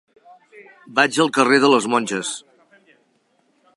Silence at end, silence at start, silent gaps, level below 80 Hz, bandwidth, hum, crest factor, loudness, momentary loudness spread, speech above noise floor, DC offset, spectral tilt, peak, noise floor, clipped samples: 1.4 s; 0.55 s; none; -76 dBFS; 11.5 kHz; none; 20 dB; -17 LUFS; 12 LU; 45 dB; under 0.1%; -3.5 dB/octave; -2 dBFS; -63 dBFS; under 0.1%